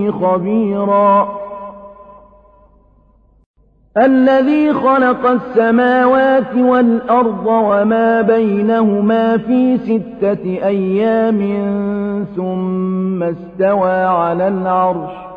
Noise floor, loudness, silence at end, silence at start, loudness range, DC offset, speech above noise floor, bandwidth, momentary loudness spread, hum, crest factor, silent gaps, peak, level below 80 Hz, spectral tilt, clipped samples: -50 dBFS; -14 LUFS; 0 s; 0 s; 5 LU; under 0.1%; 37 dB; 5 kHz; 8 LU; none; 12 dB; 3.46-3.54 s; -2 dBFS; -52 dBFS; -9.5 dB/octave; under 0.1%